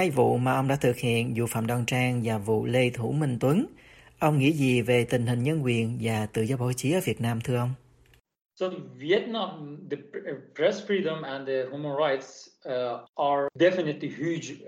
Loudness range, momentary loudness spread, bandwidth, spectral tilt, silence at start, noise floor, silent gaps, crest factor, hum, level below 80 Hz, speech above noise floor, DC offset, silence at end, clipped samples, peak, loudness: 5 LU; 11 LU; 16 kHz; -6 dB/octave; 0 s; -61 dBFS; 13.09-13.13 s; 18 dB; none; -60 dBFS; 34 dB; under 0.1%; 0 s; under 0.1%; -10 dBFS; -27 LUFS